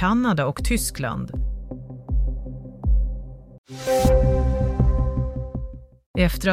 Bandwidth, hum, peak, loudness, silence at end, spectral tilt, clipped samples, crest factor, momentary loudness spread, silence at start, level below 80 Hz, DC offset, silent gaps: 16 kHz; none; -6 dBFS; -24 LUFS; 0 s; -6 dB/octave; under 0.1%; 16 dB; 17 LU; 0 s; -26 dBFS; under 0.1%; 3.58-3.64 s, 6.06-6.14 s